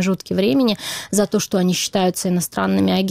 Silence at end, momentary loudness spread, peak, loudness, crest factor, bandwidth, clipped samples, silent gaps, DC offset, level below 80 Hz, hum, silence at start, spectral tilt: 0 s; 4 LU; -6 dBFS; -19 LUFS; 12 dB; 16.5 kHz; under 0.1%; none; under 0.1%; -52 dBFS; none; 0 s; -4.5 dB/octave